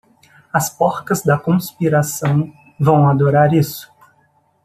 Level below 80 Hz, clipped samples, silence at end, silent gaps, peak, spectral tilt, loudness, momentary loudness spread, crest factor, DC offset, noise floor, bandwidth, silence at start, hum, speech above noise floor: -56 dBFS; under 0.1%; 0.8 s; none; -2 dBFS; -6.5 dB/octave; -16 LUFS; 8 LU; 16 dB; under 0.1%; -58 dBFS; 15.5 kHz; 0.55 s; none; 43 dB